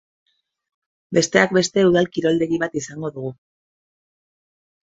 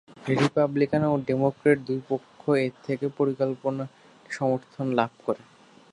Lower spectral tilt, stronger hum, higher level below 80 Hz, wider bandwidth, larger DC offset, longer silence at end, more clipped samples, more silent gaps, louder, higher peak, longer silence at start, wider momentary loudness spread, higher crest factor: second, -4.5 dB/octave vs -7.5 dB/octave; neither; first, -60 dBFS vs -66 dBFS; second, 8 kHz vs 11 kHz; neither; first, 1.55 s vs 0.55 s; neither; neither; first, -19 LUFS vs -26 LUFS; first, 0 dBFS vs -6 dBFS; first, 1.1 s vs 0.15 s; first, 13 LU vs 9 LU; about the same, 22 dB vs 20 dB